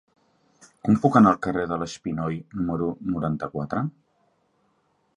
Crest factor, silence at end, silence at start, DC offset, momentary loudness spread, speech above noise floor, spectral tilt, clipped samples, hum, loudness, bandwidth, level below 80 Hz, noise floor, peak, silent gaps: 22 dB; 1.25 s; 0.85 s; under 0.1%; 12 LU; 45 dB; -7.5 dB/octave; under 0.1%; none; -24 LUFS; 9.4 kHz; -54 dBFS; -68 dBFS; -4 dBFS; none